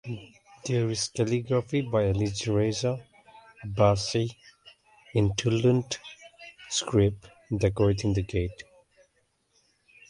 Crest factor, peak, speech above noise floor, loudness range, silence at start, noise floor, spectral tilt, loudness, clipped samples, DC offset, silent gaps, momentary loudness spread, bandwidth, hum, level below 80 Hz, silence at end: 20 dB; -8 dBFS; 45 dB; 2 LU; 0.05 s; -71 dBFS; -5.5 dB/octave; -27 LUFS; under 0.1%; under 0.1%; none; 16 LU; 11.5 kHz; none; -46 dBFS; 1.45 s